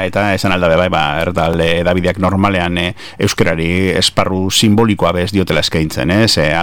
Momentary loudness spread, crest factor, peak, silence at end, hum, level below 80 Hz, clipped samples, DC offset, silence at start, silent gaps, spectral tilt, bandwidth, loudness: 4 LU; 12 dB; -2 dBFS; 0 s; none; -34 dBFS; under 0.1%; under 0.1%; 0 s; none; -5 dB/octave; 18 kHz; -13 LUFS